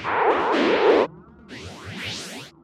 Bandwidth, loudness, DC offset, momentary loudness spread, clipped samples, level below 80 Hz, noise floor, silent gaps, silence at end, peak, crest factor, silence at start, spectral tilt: 14 kHz; -21 LUFS; under 0.1%; 20 LU; under 0.1%; -58 dBFS; -43 dBFS; none; 0.15 s; -6 dBFS; 16 dB; 0 s; -4.5 dB/octave